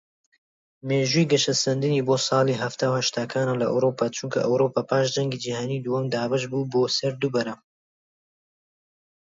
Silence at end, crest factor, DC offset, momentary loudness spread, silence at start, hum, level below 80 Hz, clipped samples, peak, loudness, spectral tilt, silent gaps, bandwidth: 1.7 s; 18 dB; under 0.1%; 7 LU; 0.85 s; none; -68 dBFS; under 0.1%; -8 dBFS; -24 LUFS; -4.5 dB/octave; none; 7.8 kHz